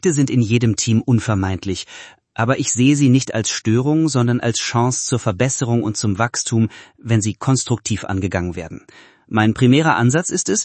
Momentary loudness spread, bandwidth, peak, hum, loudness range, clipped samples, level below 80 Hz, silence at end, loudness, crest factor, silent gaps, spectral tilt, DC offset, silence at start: 10 LU; 8.8 kHz; 0 dBFS; none; 3 LU; under 0.1%; -52 dBFS; 0 s; -18 LUFS; 18 dB; none; -5 dB/octave; under 0.1%; 0.05 s